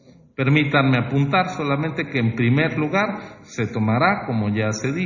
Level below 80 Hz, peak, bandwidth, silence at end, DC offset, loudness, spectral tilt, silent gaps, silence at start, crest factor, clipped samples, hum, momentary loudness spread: -52 dBFS; -4 dBFS; 7.4 kHz; 0 s; under 0.1%; -20 LUFS; -6.5 dB/octave; none; 0.4 s; 18 dB; under 0.1%; none; 8 LU